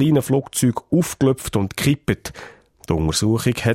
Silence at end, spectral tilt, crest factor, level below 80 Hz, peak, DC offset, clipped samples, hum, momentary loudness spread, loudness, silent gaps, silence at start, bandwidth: 0 s; -5.5 dB/octave; 16 dB; -40 dBFS; -4 dBFS; under 0.1%; under 0.1%; none; 7 LU; -20 LUFS; none; 0 s; 16.5 kHz